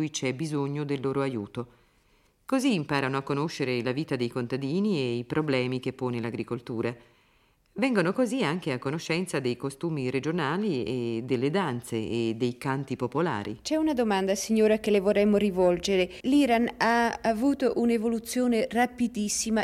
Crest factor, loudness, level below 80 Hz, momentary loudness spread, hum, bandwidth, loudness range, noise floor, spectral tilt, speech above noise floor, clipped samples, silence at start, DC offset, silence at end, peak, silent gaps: 18 dB; -27 LUFS; -58 dBFS; 8 LU; none; 15.5 kHz; 6 LU; -65 dBFS; -5.5 dB/octave; 38 dB; under 0.1%; 0 s; under 0.1%; 0 s; -8 dBFS; none